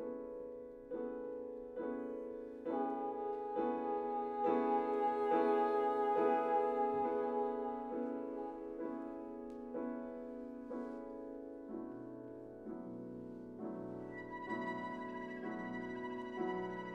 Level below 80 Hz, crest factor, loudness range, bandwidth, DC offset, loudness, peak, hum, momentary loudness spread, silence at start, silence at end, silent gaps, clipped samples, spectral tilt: -72 dBFS; 18 dB; 13 LU; 6.2 kHz; under 0.1%; -40 LUFS; -22 dBFS; none; 14 LU; 0 s; 0 s; none; under 0.1%; -7.5 dB/octave